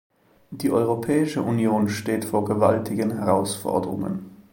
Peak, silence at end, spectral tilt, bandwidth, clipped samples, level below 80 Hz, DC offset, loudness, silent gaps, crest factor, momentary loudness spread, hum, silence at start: -4 dBFS; 0.1 s; -6.5 dB/octave; 17 kHz; under 0.1%; -60 dBFS; under 0.1%; -23 LUFS; none; 18 dB; 8 LU; none; 0.5 s